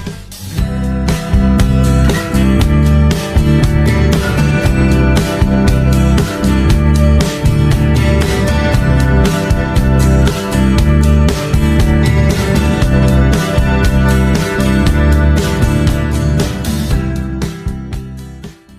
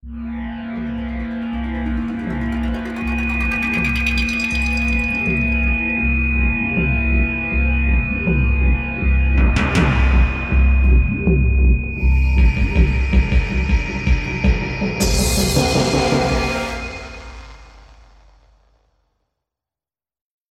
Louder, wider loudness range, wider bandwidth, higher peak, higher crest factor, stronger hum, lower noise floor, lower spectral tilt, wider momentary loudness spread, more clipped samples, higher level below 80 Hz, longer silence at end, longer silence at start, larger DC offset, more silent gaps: first, -12 LUFS vs -18 LUFS; second, 2 LU vs 6 LU; first, 15.5 kHz vs 13.5 kHz; about the same, 0 dBFS vs -2 dBFS; second, 10 dB vs 16 dB; neither; second, -31 dBFS vs under -90 dBFS; about the same, -6.5 dB/octave vs -5.5 dB/octave; about the same, 7 LU vs 9 LU; neither; about the same, -16 dBFS vs -20 dBFS; second, 0.25 s vs 2.85 s; about the same, 0 s vs 0.05 s; neither; neither